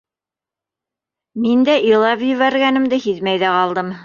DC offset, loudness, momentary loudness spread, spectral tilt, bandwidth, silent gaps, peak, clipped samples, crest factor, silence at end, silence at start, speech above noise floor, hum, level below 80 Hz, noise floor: under 0.1%; -15 LUFS; 6 LU; -6 dB/octave; 7 kHz; none; -2 dBFS; under 0.1%; 14 dB; 0 s; 1.35 s; 73 dB; none; -62 dBFS; -88 dBFS